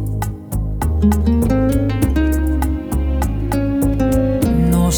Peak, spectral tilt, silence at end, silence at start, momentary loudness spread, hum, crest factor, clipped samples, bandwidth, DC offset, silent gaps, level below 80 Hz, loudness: -4 dBFS; -7 dB/octave; 0 s; 0 s; 7 LU; none; 12 dB; under 0.1%; over 20 kHz; under 0.1%; none; -20 dBFS; -17 LUFS